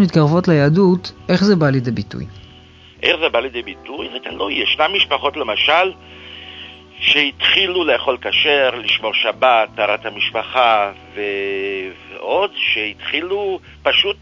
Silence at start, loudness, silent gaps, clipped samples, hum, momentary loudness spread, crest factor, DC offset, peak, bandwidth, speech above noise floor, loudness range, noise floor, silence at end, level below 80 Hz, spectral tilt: 0 s; -16 LUFS; none; under 0.1%; none; 16 LU; 18 dB; under 0.1%; 0 dBFS; 7.6 kHz; 26 dB; 4 LU; -43 dBFS; 0.05 s; -48 dBFS; -6 dB/octave